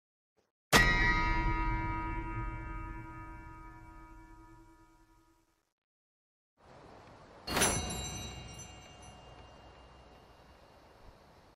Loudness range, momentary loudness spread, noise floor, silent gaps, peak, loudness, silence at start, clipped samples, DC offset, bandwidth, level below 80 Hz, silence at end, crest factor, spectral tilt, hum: 22 LU; 28 LU; -71 dBFS; 5.72-6.57 s; -10 dBFS; -32 LUFS; 0.7 s; under 0.1%; under 0.1%; 14.5 kHz; -44 dBFS; 0.45 s; 26 dB; -3 dB/octave; none